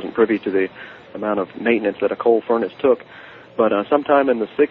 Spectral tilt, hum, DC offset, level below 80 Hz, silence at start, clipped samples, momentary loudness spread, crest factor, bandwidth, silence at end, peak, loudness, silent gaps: -9 dB/octave; none; under 0.1%; -62 dBFS; 0 s; under 0.1%; 14 LU; 18 dB; 4.3 kHz; 0.05 s; -2 dBFS; -19 LUFS; none